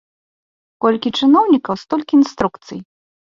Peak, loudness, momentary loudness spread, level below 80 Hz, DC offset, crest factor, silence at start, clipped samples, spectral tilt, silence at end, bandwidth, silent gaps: -2 dBFS; -16 LUFS; 18 LU; -54 dBFS; under 0.1%; 16 dB; 0.8 s; under 0.1%; -5.5 dB/octave; 0.5 s; 7.4 kHz; none